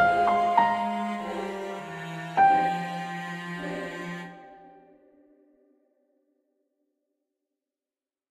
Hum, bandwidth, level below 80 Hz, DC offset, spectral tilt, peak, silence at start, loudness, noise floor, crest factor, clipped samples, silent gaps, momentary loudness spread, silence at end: none; 13.5 kHz; -66 dBFS; under 0.1%; -5.5 dB/octave; -8 dBFS; 0 s; -27 LUFS; under -90 dBFS; 22 dB; under 0.1%; none; 15 LU; 3.6 s